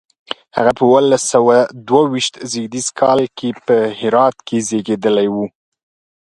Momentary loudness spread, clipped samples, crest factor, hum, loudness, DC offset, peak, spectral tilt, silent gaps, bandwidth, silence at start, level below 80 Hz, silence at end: 11 LU; under 0.1%; 16 dB; none; -15 LUFS; under 0.1%; 0 dBFS; -4 dB/octave; none; 11.5 kHz; 0.3 s; -58 dBFS; 0.75 s